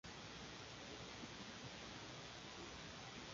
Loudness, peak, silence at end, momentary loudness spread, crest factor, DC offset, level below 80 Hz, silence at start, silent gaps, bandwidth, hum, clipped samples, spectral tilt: -53 LUFS; -38 dBFS; 0 s; 1 LU; 16 dB; under 0.1%; -70 dBFS; 0.05 s; none; 7.4 kHz; none; under 0.1%; -2.5 dB/octave